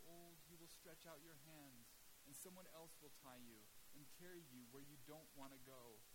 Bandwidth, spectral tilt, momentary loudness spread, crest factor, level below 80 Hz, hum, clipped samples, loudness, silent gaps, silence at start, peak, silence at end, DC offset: 16.5 kHz; -3.5 dB/octave; 5 LU; 20 dB; -80 dBFS; none; under 0.1%; -62 LUFS; none; 0 s; -42 dBFS; 0 s; under 0.1%